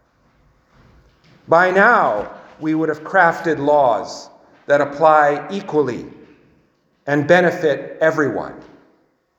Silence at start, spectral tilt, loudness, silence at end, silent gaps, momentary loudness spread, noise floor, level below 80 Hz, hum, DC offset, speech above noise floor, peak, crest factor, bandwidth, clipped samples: 1.5 s; -6 dB/octave; -16 LUFS; 0.75 s; none; 15 LU; -60 dBFS; -60 dBFS; none; under 0.1%; 44 dB; 0 dBFS; 18 dB; 8.4 kHz; under 0.1%